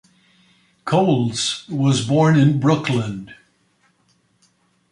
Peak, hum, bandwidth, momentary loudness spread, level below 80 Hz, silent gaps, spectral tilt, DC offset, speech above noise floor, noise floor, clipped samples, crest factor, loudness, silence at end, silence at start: -2 dBFS; none; 11.5 kHz; 11 LU; -58 dBFS; none; -6 dB/octave; under 0.1%; 45 dB; -62 dBFS; under 0.1%; 18 dB; -18 LUFS; 1.55 s; 0.85 s